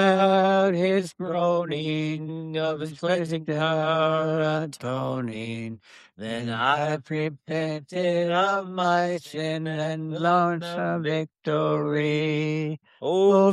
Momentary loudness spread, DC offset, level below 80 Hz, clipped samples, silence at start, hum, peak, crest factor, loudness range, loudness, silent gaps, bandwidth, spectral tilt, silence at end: 9 LU; under 0.1%; -72 dBFS; under 0.1%; 0 s; none; -8 dBFS; 16 dB; 3 LU; -25 LUFS; none; 12.5 kHz; -6.5 dB/octave; 0 s